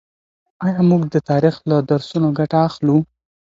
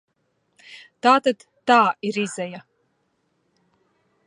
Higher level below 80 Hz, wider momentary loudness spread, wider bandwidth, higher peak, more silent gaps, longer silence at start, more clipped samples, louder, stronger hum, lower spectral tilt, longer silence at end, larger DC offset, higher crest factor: first, -56 dBFS vs -78 dBFS; second, 5 LU vs 25 LU; second, 7.6 kHz vs 11 kHz; about the same, -2 dBFS vs -2 dBFS; neither; about the same, 0.6 s vs 0.7 s; neither; first, -17 LUFS vs -20 LUFS; neither; first, -9 dB/octave vs -4 dB/octave; second, 0.45 s vs 1.7 s; neither; second, 16 dB vs 22 dB